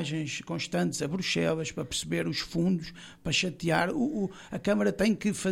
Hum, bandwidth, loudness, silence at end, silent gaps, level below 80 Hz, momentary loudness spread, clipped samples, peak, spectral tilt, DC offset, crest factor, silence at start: none; 16 kHz; -29 LUFS; 0 s; none; -56 dBFS; 7 LU; under 0.1%; -12 dBFS; -4.5 dB/octave; under 0.1%; 16 dB; 0 s